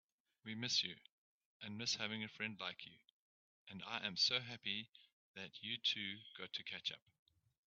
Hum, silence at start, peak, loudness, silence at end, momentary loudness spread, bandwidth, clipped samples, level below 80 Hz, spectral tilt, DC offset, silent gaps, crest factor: none; 0.45 s; -24 dBFS; -42 LUFS; 0.7 s; 21 LU; 7.4 kHz; under 0.1%; -88 dBFS; -0.5 dB/octave; under 0.1%; 1.12-1.60 s, 3.12-3.67 s, 4.89-4.93 s, 5.13-5.34 s; 22 dB